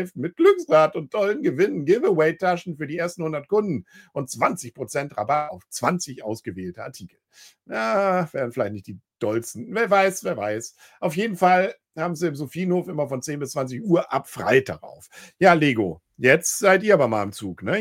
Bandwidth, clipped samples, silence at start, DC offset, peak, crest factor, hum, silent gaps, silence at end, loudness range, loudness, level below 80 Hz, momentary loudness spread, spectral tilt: 16.5 kHz; under 0.1%; 0 s; under 0.1%; -2 dBFS; 22 dB; none; none; 0 s; 7 LU; -22 LUFS; -66 dBFS; 14 LU; -5 dB/octave